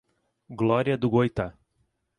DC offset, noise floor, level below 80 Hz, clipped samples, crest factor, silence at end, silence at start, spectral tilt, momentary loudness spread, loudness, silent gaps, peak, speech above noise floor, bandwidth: under 0.1%; -73 dBFS; -52 dBFS; under 0.1%; 18 dB; 0.7 s; 0.5 s; -8.5 dB/octave; 12 LU; -25 LUFS; none; -8 dBFS; 49 dB; 10.5 kHz